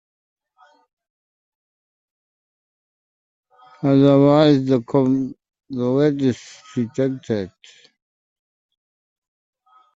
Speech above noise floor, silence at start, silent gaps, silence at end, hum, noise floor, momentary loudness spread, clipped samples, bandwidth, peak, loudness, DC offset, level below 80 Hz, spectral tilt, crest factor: 39 dB; 3.8 s; none; 2.45 s; none; -56 dBFS; 17 LU; under 0.1%; 7.8 kHz; -2 dBFS; -18 LUFS; under 0.1%; -62 dBFS; -8 dB/octave; 20 dB